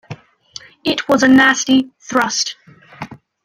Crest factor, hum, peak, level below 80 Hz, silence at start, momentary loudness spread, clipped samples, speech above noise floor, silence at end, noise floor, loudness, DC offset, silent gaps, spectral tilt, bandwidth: 16 dB; none; -2 dBFS; -56 dBFS; 0.1 s; 25 LU; under 0.1%; 25 dB; 0.3 s; -39 dBFS; -14 LUFS; under 0.1%; none; -2.5 dB/octave; 15 kHz